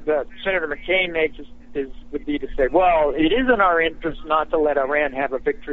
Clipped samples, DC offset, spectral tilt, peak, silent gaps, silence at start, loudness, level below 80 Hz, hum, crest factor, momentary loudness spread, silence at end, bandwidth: under 0.1%; 1%; -2 dB/octave; -4 dBFS; none; 0 s; -20 LUFS; -38 dBFS; none; 16 dB; 13 LU; 0 s; 4.1 kHz